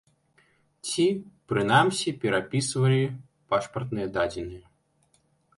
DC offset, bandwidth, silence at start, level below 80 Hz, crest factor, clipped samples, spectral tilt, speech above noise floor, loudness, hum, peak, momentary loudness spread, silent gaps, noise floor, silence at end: under 0.1%; 11.5 kHz; 0.85 s; -58 dBFS; 20 dB; under 0.1%; -5 dB/octave; 42 dB; -26 LUFS; none; -8 dBFS; 14 LU; none; -67 dBFS; 1 s